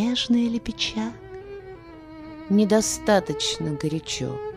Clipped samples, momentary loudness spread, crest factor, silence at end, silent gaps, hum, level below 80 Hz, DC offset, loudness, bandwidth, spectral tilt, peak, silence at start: under 0.1%; 20 LU; 18 dB; 0 s; none; none; -50 dBFS; under 0.1%; -23 LUFS; 15.5 kHz; -4 dB/octave; -6 dBFS; 0 s